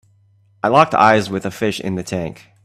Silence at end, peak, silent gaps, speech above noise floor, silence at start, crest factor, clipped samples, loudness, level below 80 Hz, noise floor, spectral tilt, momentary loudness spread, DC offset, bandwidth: 0.3 s; 0 dBFS; none; 38 dB; 0.65 s; 18 dB; under 0.1%; -17 LUFS; -54 dBFS; -55 dBFS; -5.5 dB/octave; 13 LU; under 0.1%; 14.5 kHz